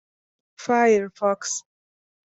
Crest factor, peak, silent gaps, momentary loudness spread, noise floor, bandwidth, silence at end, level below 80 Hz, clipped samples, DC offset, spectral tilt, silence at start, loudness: 18 dB; -6 dBFS; none; 12 LU; under -90 dBFS; 8.2 kHz; 0.7 s; -70 dBFS; under 0.1%; under 0.1%; -3.5 dB/octave; 0.6 s; -22 LUFS